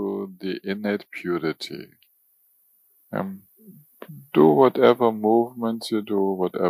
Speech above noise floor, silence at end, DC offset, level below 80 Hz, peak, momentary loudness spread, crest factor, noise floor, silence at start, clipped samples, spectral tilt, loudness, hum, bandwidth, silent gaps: 41 dB; 0 s; under 0.1%; -72 dBFS; -2 dBFS; 18 LU; 20 dB; -63 dBFS; 0 s; under 0.1%; -7 dB/octave; -22 LUFS; none; 15.5 kHz; none